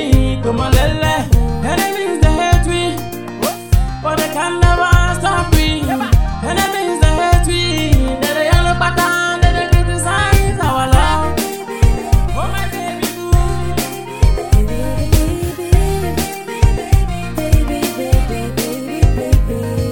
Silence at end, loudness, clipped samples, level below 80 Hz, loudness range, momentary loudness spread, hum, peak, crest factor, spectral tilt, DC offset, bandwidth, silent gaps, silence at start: 0 s; -15 LUFS; 0.3%; -18 dBFS; 3 LU; 7 LU; none; 0 dBFS; 14 dB; -5.5 dB/octave; 2%; 18 kHz; none; 0 s